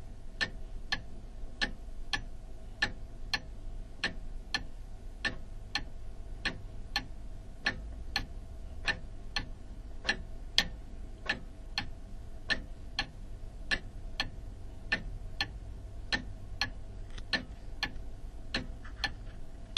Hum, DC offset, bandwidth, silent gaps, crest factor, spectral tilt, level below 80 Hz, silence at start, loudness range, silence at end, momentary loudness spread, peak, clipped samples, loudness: none; under 0.1%; 13 kHz; none; 32 dB; -3 dB/octave; -42 dBFS; 0 s; 3 LU; 0 s; 14 LU; -6 dBFS; under 0.1%; -37 LUFS